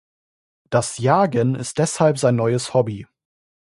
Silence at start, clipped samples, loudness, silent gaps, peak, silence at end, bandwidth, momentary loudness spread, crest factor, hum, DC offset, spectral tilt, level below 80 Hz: 0.7 s; under 0.1%; -19 LUFS; none; -2 dBFS; 0.7 s; 11.5 kHz; 6 LU; 18 dB; none; under 0.1%; -5.5 dB/octave; -56 dBFS